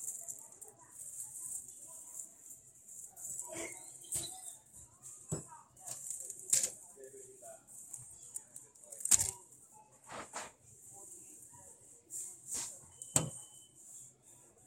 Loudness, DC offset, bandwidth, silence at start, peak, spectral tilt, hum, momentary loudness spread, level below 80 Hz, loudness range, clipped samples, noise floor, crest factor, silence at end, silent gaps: -38 LUFS; under 0.1%; 16.5 kHz; 0 s; -4 dBFS; -1.5 dB/octave; none; 22 LU; -72 dBFS; 9 LU; under 0.1%; -62 dBFS; 40 dB; 0 s; none